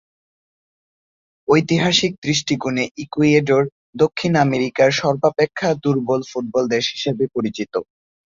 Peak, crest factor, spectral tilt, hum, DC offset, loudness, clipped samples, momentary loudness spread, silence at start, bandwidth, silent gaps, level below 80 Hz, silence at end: -2 dBFS; 18 dB; -5 dB/octave; none; under 0.1%; -19 LUFS; under 0.1%; 8 LU; 1.5 s; 7.6 kHz; 2.18-2.22 s, 2.91-2.95 s, 3.72-3.93 s; -56 dBFS; 0.45 s